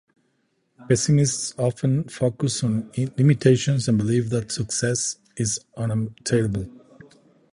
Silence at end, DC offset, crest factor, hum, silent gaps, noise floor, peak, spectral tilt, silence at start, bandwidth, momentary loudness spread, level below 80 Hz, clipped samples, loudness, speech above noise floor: 0.75 s; under 0.1%; 20 dB; none; none; -69 dBFS; -4 dBFS; -5.5 dB/octave; 0.8 s; 11.5 kHz; 8 LU; -52 dBFS; under 0.1%; -23 LUFS; 47 dB